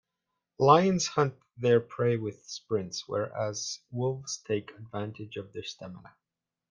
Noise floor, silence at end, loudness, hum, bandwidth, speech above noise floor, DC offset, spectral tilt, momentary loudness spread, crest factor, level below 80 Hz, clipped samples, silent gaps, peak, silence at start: -85 dBFS; 0.75 s; -29 LUFS; none; 10 kHz; 55 dB; under 0.1%; -5 dB/octave; 18 LU; 24 dB; -70 dBFS; under 0.1%; none; -6 dBFS; 0.6 s